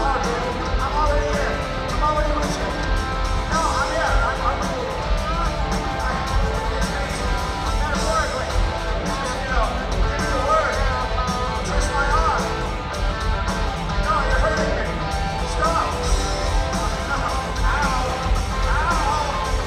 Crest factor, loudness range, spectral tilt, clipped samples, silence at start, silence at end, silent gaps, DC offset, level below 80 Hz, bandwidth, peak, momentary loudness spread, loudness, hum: 16 dB; 1 LU; -4.5 dB/octave; under 0.1%; 0 s; 0 s; none; under 0.1%; -24 dBFS; 13 kHz; -6 dBFS; 4 LU; -22 LUFS; none